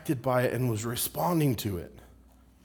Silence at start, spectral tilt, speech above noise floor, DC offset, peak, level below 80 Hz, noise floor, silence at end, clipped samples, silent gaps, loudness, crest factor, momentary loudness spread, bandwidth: 0 s; -5.5 dB/octave; 28 dB; under 0.1%; -12 dBFS; -56 dBFS; -57 dBFS; 0.6 s; under 0.1%; none; -29 LUFS; 18 dB; 9 LU; over 20 kHz